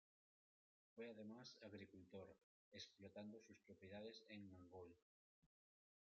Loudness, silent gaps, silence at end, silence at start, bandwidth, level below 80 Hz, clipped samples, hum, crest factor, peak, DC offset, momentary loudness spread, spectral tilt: -61 LUFS; 2.44-2.72 s, 5.02-5.42 s; 0.6 s; 0.95 s; 7 kHz; under -90 dBFS; under 0.1%; none; 18 dB; -44 dBFS; under 0.1%; 8 LU; -4 dB/octave